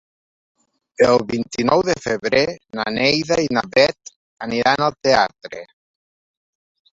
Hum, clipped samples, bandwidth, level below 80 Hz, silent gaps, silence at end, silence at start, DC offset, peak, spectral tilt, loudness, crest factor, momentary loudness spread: none; under 0.1%; 7.8 kHz; -54 dBFS; 4.16-4.37 s; 1.3 s; 1 s; under 0.1%; -2 dBFS; -4 dB/octave; -18 LUFS; 18 dB; 12 LU